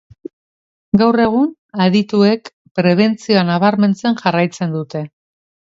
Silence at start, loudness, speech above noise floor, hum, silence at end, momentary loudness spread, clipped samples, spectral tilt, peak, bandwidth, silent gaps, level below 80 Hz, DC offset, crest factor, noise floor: 0.95 s; -15 LUFS; over 76 dB; none; 0.6 s; 10 LU; under 0.1%; -7 dB/octave; 0 dBFS; 7.8 kHz; 1.58-1.69 s, 2.53-2.65 s, 2.71-2.75 s; -54 dBFS; under 0.1%; 16 dB; under -90 dBFS